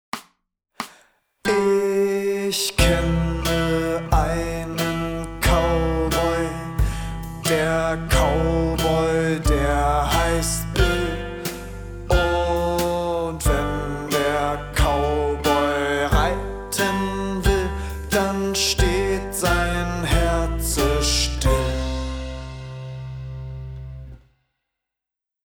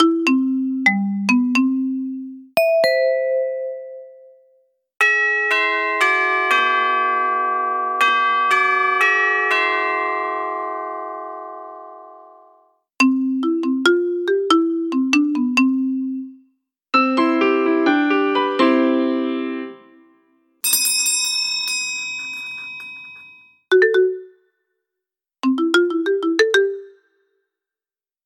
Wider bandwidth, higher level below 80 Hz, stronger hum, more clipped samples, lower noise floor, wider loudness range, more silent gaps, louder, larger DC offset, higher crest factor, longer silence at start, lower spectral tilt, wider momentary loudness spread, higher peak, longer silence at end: about the same, over 20 kHz vs 19 kHz; first, -28 dBFS vs -84 dBFS; neither; neither; about the same, -87 dBFS vs under -90 dBFS; about the same, 3 LU vs 5 LU; neither; second, -22 LUFS vs -18 LUFS; neither; about the same, 18 dB vs 16 dB; first, 0.15 s vs 0 s; first, -4.5 dB/octave vs -2.5 dB/octave; about the same, 14 LU vs 14 LU; about the same, -4 dBFS vs -4 dBFS; about the same, 1.25 s vs 1.35 s